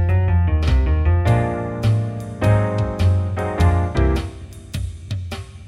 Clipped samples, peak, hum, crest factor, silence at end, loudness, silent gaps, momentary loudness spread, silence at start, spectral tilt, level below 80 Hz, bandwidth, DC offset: under 0.1%; -4 dBFS; none; 14 dB; 0 s; -20 LUFS; none; 12 LU; 0 s; -7.5 dB/octave; -24 dBFS; 11.5 kHz; under 0.1%